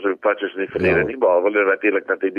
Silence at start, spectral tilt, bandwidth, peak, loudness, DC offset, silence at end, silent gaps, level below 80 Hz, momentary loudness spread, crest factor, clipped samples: 0 s; -8.5 dB/octave; 5.2 kHz; -6 dBFS; -19 LUFS; under 0.1%; 0 s; none; -50 dBFS; 5 LU; 12 dB; under 0.1%